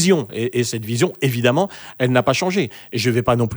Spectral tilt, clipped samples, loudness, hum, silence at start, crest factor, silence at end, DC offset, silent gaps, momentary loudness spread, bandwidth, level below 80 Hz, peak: -5 dB/octave; under 0.1%; -19 LUFS; none; 0 s; 16 dB; 0 s; under 0.1%; none; 6 LU; over 20 kHz; -52 dBFS; -2 dBFS